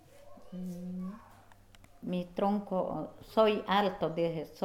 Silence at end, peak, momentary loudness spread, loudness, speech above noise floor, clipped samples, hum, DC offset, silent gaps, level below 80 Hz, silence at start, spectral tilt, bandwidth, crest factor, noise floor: 0 s; -14 dBFS; 16 LU; -33 LUFS; 25 dB; under 0.1%; none; under 0.1%; none; -62 dBFS; 0.15 s; -7 dB/octave; 16 kHz; 20 dB; -57 dBFS